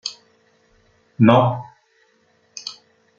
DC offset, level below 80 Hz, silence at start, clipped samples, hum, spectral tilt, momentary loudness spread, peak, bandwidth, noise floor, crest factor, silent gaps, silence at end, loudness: under 0.1%; -62 dBFS; 0.05 s; under 0.1%; none; -6.5 dB/octave; 20 LU; -2 dBFS; 7.6 kHz; -61 dBFS; 22 dB; none; 0.45 s; -17 LUFS